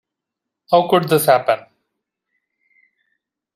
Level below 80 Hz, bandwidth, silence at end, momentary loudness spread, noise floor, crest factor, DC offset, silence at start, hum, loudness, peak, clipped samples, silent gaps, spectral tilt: -66 dBFS; 16 kHz; 1.95 s; 7 LU; -82 dBFS; 20 dB; under 0.1%; 0.7 s; none; -16 LUFS; 0 dBFS; under 0.1%; none; -4.5 dB/octave